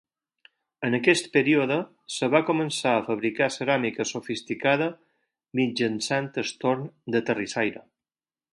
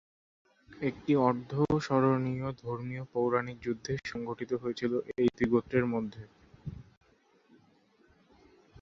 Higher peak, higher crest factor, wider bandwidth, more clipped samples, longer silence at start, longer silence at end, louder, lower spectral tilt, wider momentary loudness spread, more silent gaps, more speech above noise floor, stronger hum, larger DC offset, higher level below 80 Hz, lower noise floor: first, -4 dBFS vs -12 dBFS; about the same, 22 dB vs 22 dB; first, 11.5 kHz vs 7.6 kHz; neither; about the same, 0.8 s vs 0.7 s; second, 0.75 s vs 2 s; first, -25 LUFS vs -31 LUFS; second, -4.5 dB/octave vs -7.5 dB/octave; second, 9 LU vs 14 LU; neither; first, over 65 dB vs 36 dB; neither; neither; second, -70 dBFS vs -60 dBFS; first, under -90 dBFS vs -66 dBFS